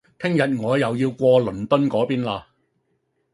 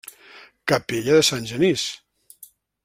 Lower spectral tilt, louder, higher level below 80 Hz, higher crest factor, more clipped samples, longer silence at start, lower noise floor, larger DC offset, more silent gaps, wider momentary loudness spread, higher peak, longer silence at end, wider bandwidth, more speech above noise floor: first, -7.5 dB/octave vs -3.5 dB/octave; about the same, -21 LUFS vs -21 LUFS; about the same, -56 dBFS vs -58 dBFS; about the same, 18 dB vs 20 dB; neither; first, 0.2 s vs 0.05 s; first, -70 dBFS vs -50 dBFS; neither; neither; second, 7 LU vs 16 LU; about the same, -4 dBFS vs -4 dBFS; first, 0.95 s vs 0.4 s; second, 11.5 kHz vs 16.5 kHz; first, 50 dB vs 30 dB